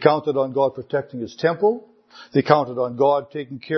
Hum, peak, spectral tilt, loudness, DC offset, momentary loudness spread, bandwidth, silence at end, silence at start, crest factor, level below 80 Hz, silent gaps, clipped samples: none; 0 dBFS; -7.5 dB/octave; -21 LUFS; under 0.1%; 13 LU; 6.4 kHz; 0 s; 0 s; 20 dB; -66 dBFS; none; under 0.1%